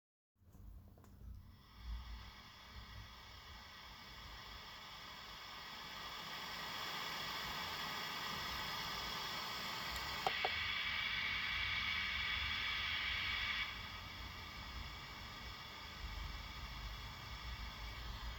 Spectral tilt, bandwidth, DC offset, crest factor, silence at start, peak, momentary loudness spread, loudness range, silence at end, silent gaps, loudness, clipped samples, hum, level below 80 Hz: -2.5 dB/octave; over 20 kHz; under 0.1%; 24 dB; 0.4 s; -22 dBFS; 17 LU; 15 LU; 0 s; none; -42 LUFS; under 0.1%; none; -56 dBFS